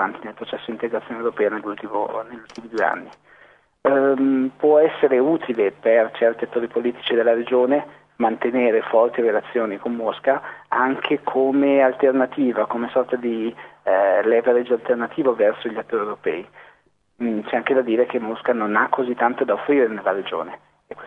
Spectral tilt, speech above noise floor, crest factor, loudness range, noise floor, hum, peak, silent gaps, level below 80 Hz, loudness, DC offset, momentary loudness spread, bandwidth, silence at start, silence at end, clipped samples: -7 dB/octave; 38 dB; 18 dB; 4 LU; -58 dBFS; 50 Hz at -55 dBFS; -2 dBFS; none; -70 dBFS; -20 LUFS; under 0.1%; 10 LU; 6 kHz; 0 s; 0 s; under 0.1%